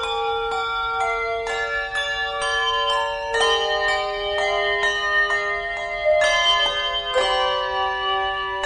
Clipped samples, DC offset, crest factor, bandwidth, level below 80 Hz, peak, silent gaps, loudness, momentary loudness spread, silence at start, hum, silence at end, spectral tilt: under 0.1%; under 0.1%; 14 dB; 10.5 kHz; -46 dBFS; -8 dBFS; none; -21 LUFS; 6 LU; 0 s; none; 0 s; -1 dB/octave